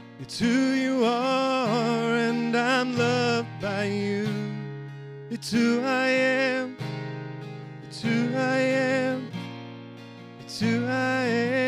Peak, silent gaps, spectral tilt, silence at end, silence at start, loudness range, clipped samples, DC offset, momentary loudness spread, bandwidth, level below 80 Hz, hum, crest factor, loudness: -10 dBFS; none; -5.5 dB/octave; 0 s; 0 s; 4 LU; under 0.1%; under 0.1%; 16 LU; 13 kHz; -66 dBFS; none; 16 dB; -25 LUFS